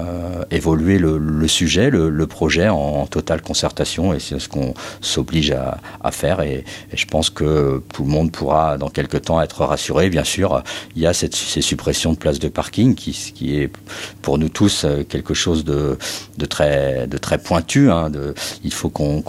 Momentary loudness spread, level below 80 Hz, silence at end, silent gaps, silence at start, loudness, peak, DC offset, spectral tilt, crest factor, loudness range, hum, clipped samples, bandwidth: 9 LU; -36 dBFS; 0 s; none; 0 s; -19 LUFS; -2 dBFS; under 0.1%; -5 dB/octave; 18 dB; 3 LU; none; under 0.1%; 16 kHz